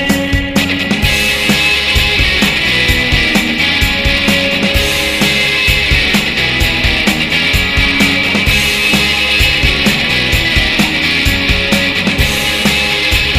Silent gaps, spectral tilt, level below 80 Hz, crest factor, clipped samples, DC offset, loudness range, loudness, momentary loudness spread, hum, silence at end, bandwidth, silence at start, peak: none; -3.5 dB/octave; -22 dBFS; 12 dB; under 0.1%; 0.4%; 1 LU; -10 LUFS; 2 LU; none; 0 s; 16.5 kHz; 0 s; 0 dBFS